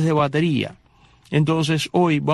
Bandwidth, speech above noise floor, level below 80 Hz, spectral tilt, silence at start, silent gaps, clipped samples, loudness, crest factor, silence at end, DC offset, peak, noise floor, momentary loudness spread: 12.5 kHz; 34 dB; -56 dBFS; -6.5 dB/octave; 0 s; none; under 0.1%; -20 LUFS; 16 dB; 0 s; under 0.1%; -6 dBFS; -53 dBFS; 6 LU